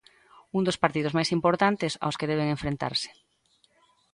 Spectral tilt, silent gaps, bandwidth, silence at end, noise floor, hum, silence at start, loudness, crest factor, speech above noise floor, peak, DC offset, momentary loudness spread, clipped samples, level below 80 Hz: -5 dB/octave; none; 11.5 kHz; 1 s; -67 dBFS; none; 0.55 s; -27 LUFS; 22 dB; 41 dB; -6 dBFS; under 0.1%; 6 LU; under 0.1%; -56 dBFS